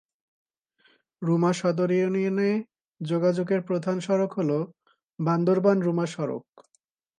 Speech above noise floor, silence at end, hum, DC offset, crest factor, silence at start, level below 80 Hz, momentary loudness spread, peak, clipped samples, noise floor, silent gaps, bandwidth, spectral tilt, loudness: 41 dB; 0.8 s; none; under 0.1%; 18 dB; 1.2 s; -76 dBFS; 9 LU; -8 dBFS; under 0.1%; -65 dBFS; 2.88-2.93 s, 5.03-5.09 s; 10 kHz; -7.5 dB/octave; -25 LUFS